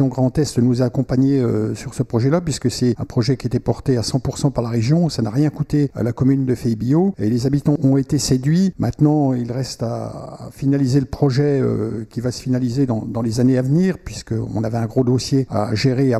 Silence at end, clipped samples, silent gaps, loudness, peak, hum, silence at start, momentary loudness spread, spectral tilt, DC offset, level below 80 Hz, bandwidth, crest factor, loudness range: 0 s; under 0.1%; none; -19 LUFS; -4 dBFS; none; 0 s; 8 LU; -7 dB/octave; under 0.1%; -42 dBFS; 13 kHz; 14 dB; 2 LU